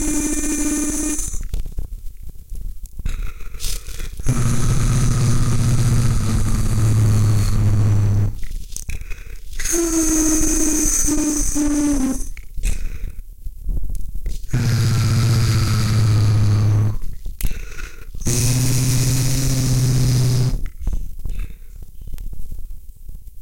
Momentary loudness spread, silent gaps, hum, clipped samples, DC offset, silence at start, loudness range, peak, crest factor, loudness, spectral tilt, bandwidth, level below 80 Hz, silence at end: 19 LU; none; none; under 0.1%; 2%; 0 s; 7 LU; -6 dBFS; 12 dB; -19 LUFS; -5 dB/octave; 17 kHz; -24 dBFS; 0 s